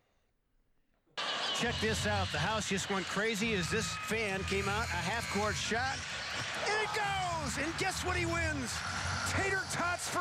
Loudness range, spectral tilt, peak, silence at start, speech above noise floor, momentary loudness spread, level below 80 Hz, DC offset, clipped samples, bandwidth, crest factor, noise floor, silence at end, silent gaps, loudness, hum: 1 LU; -3.5 dB/octave; -20 dBFS; 1.15 s; 41 dB; 4 LU; -54 dBFS; under 0.1%; under 0.1%; 16.5 kHz; 14 dB; -75 dBFS; 0 s; none; -33 LUFS; none